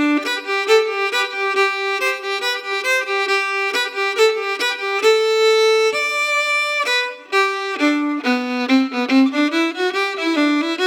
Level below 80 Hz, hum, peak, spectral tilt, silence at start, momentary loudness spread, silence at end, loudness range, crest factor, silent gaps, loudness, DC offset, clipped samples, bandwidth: -88 dBFS; none; -4 dBFS; -1 dB/octave; 0 s; 5 LU; 0 s; 2 LU; 14 dB; none; -17 LUFS; under 0.1%; under 0.1%; 18 kHz